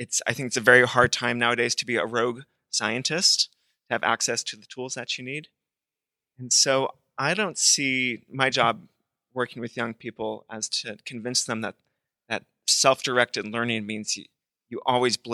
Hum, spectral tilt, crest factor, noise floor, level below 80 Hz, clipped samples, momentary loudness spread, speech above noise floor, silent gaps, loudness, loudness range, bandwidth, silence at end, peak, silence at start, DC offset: none; -2 dB/octave; 24 dB; -89 dBFS; -66 dBFS; under 0.1%; 14 LU; 64 dB; none; -24 LUFS; 7 LU; 13.5 kHz; 0 s; -2 dBFS; 0 s; under 0.1%